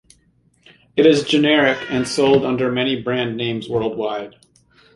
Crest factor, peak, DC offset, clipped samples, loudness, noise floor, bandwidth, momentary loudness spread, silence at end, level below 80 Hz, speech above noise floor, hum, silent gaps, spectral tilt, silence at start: 18 dB; -2 dBFS; under 0.1%; under 0.1%; -18 LUFS; -59 dBFS; 11.5 kHz; 10 LU; 0.65 s; -56 dBFS; 41 dB; none; none; -5 dB/octave; 0.95 s